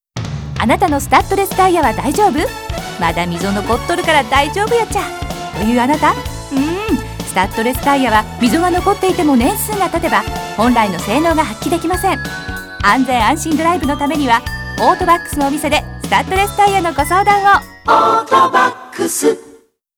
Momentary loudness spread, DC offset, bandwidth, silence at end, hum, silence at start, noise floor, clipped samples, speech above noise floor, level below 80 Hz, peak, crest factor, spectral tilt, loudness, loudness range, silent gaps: 8 LU; under 0.1%; over 20 kHz; 0.45 s; none; 0.15 s; -45 dBFS; under 0.1%; 31 dB; -32 dBFS; 0 dBFS; 14 dB; -4.5 dB/octave; -14 LUFS; 3 LU; none